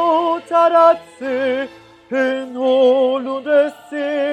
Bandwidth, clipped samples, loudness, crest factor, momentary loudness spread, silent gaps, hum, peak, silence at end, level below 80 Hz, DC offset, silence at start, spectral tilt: 9.4 kHz; under 0.1%; -17 LUFS; 16 dB; 11 LU; none; none; 0 dBFS; 0 s; -68 dBFS; under 0.1%; 0 s; -4.5 dB/octave